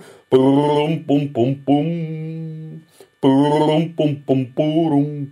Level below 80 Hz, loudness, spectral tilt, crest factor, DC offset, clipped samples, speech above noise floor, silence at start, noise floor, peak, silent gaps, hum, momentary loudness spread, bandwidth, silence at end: -66 dBFS; -18 LUFS; -8.5 dB/octave; 16 dB; under 0.1%; under 0.1%; 25 dB; 0.3 s; -42 dBFS; -2 dBFS; none; none; 13 LU; 10.5 kHz; 0 s